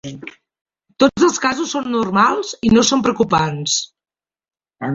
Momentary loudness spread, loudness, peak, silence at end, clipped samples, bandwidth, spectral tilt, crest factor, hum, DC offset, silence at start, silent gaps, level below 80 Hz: 17 LU; -16 LUFS; -2 dBFS; 0 s; under 0.1%; 7.8 kHz; -4 dB/octave; 16 dB; none; under 0.1%; 0.05 s; 0.61-0.65 s; -48 dBFS